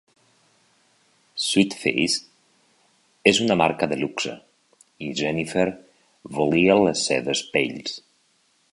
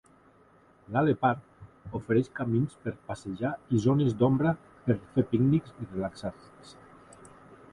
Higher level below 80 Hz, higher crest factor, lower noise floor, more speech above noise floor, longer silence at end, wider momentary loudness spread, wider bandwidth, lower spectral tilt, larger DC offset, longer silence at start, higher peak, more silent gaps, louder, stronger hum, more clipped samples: about the same, -58 dBFS vs -58 dBFS; about the same, 22 dB vs 18 dB; first, -65 dBFS vs -60 dBFS; first, 43 dB vs 32 dB; first, 0.75 s vs 0.2 s; about the same, 15 LU vs 14 LU; about the same, 11.5 kHz vs 11 kHz; second, -4 dB/octave vs -8.5 dB/octave; neither; first, 1.35 s vs 0.9 s; first, -2 dBFS vs -12 dBFS; neither; first, -22 LUFS vs -29 LUFS; neither; neither